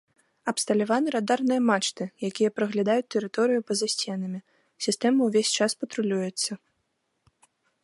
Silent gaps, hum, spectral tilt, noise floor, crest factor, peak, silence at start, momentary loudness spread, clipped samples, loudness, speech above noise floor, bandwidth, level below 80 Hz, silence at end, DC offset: none; none; -3.5 dB/octave; -76 dBFS; 18 dB; -8 dBFS; 0.45 s; 9 LU; under 0.1%; -26 LUFS; 50 dB; 11.5 kHz; -78 dBFS; 1.25 s; under 0.1%